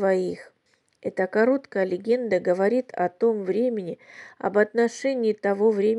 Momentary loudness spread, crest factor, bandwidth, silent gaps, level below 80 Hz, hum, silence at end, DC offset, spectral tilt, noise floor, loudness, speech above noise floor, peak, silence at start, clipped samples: 11 LU; 16 dB; 11 kHz; none; -78 dBFS; none; 0 s; under 0.1%; -6.5 dB/octave; -68 dBFS; -24 LUFS; 44 dB; -8 dBFS; 0 s; under 0.1%